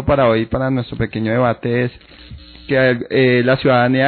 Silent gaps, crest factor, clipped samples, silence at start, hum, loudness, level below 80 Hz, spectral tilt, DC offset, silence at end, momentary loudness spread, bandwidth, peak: none; 14 dB; under 0.1%; 0 s; none; -16 LUFS; -38 dBFS; -5 dB/octave; under 0.1%; 0 s; 7 LU; 4.5 kHz; -2 dBFS